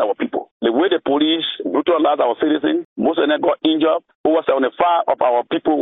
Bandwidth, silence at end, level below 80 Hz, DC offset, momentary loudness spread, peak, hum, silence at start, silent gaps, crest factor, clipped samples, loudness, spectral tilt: 3.9 kHz; 0 s; -62 dBFS; under 0.1%; 4 LU; -2 dBFS; none; 0 s; 0.51-0.60 s, 2.85-2.96 s, 4.15-4.24 s; 16 dB; under 0.1%; -18 LUFS; -2 dB/octave